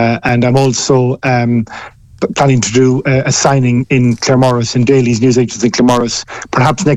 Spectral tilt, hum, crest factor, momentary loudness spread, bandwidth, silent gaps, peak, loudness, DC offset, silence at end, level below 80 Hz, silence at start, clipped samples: -5.5 dB/octave; none; 12 dB; 7 LU; 11 kHz; none; 0 dBFS; -11 LUFS; under 0.1%; 0 s; -42 dBFS; 0 s; under 0.1%